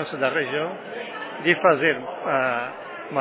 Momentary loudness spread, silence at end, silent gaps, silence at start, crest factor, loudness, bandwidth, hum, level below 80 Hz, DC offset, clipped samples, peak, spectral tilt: 14 LU; 0 s; none; 0 s; 20 dB; -23 LUFS; 4 kHz; none; -74 dBFS; under 0.1%; under 0.1%; -4 dBFS; -8.5 dB/octave